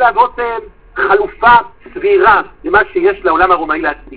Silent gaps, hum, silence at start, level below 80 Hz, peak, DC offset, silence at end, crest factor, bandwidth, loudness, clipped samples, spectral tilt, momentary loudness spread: none; none; 0 s; -38 dBFS; 0 dBFS; 0.9%; 0 s; 12 dB; 4 kHz; -12 LUFS; 0.5%; -8 dB/octave; 11 LU